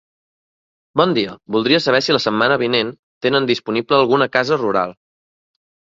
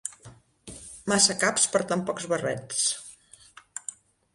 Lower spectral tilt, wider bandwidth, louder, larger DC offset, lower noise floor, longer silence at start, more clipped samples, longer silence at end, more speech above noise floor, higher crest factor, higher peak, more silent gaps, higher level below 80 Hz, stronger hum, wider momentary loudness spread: first, -5 dB/octave vs -2 dB/octave; second, 7.8 kHz vs 11.5 kHz; first, -17 LUFS vs -25 LUFS; neither; first, under -90 dBFS vs -53 dBFS; first, 0.95 s vs 0.05 s; neither; first, 1.05 s vs 0.45 s; first, over 73 dB vs 28 dB; second, 18 dB vs 24 dB; first, 0 dBFS vs -6 dBFS; first, 2.99-3.21 s vs none; about the same, -60 dBFS vs -64 dBFS; neither; second, 7 LU vs 21 LU